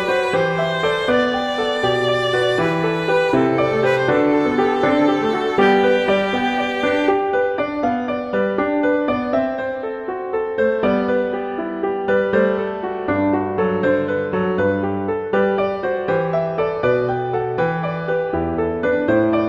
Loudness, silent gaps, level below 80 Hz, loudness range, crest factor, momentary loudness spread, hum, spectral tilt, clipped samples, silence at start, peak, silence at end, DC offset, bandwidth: -19 LUFS; none; -48 dBFS; 4 LU; 16 dB; 6 LU; none; -6.5 dB/octave; under 0.1%; 0 s; -2 dBFS; 0 s; under 0.1%; 10.5 kHz